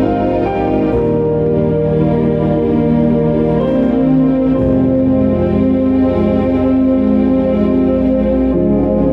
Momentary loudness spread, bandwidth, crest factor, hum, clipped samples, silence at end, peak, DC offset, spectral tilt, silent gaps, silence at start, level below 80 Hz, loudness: 2 LU; 5 kHz; 10 dB; none; under 0.1%; 0 s; -2 dBFS; under 0.1%; -11 dB/octave; none; 0 s; -30 dBFS; -13 LUFS